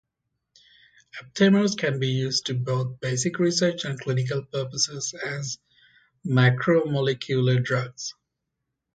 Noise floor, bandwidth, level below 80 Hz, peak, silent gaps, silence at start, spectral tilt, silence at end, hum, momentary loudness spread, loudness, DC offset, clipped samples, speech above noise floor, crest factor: -81 dBFS; 9.2 kHz; -64 dBFS; -6 dBFS; none; 1.15 s; -5 dB/octave; 0.85 s; none; 14 LU; -24 LUFS; under 0.1%; under 0.1%; 58 dB; 20 dB